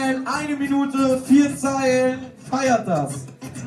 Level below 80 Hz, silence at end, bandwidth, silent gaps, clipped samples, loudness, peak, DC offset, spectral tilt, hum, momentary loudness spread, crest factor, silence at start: -58 dBFS; 0 s; 13 kHz; none; under 0.1%; -20 LUFS; -6 dBFS; under 0.1%; -5 dB/octave; none; 12 LU; 14 dB; 0 s